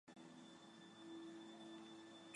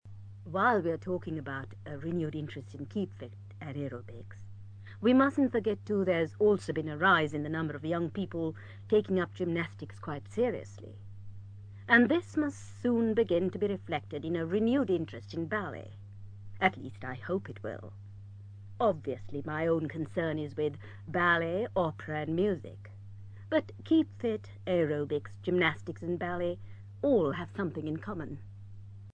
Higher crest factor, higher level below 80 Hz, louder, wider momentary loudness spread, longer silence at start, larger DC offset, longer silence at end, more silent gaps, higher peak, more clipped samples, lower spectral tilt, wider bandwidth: about the same, 18 dB vs 22 dB; second, under -90 dBFS vs -62 dBFS; second, -58 LUFS vs -32 LUFS; second, 6 LU vs 22 LU; about the same, 0.05 s vs 0.05 s; neither; about the same, 0 s vs 0 s; neither; second, -40 dBFS vs -10 dBFS; neither; second, -4 dB/octave vs -7.5 dB/octave; first, 11 kHz vs 9.6 kHz